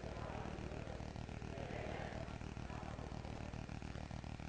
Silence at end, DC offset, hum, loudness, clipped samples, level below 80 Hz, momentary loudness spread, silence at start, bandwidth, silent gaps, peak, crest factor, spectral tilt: 0 s; under 0.1%; none; -48 LUFS; under 0.1%; -54 dBFS; 3 LU; 0 s; 9.6 kHz; none; -32 dBFS; 16 dB; -6.5 dB/octave